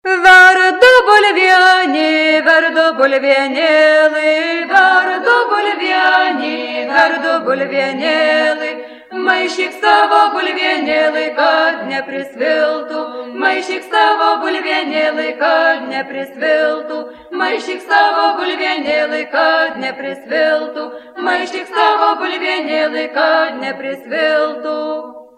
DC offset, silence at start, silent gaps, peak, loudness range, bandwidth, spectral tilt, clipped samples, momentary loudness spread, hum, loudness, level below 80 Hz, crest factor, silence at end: under 0.1%; 0.05 s; none; 0 dBFS; 6 LU; 13.5 kHz; -2.5 dB/octave; 0.2%; 13 LU; none; -13 LUFS; -58 dBFS; 14 dB; 0.15 s